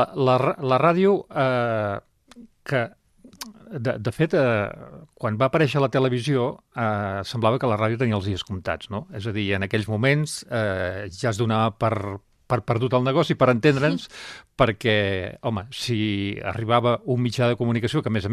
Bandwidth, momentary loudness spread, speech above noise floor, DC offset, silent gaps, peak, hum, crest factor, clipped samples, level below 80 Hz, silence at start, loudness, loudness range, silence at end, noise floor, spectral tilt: 14 kHz; 11 LU; 27 dB; under 0.1%; none; -2 dBFS; none; 20 dB; under 0.1%; -54 dBFS; 0 s; -23 LUFS; 3 LU; 0 s; -49 dBFS; -6.5 dB/octave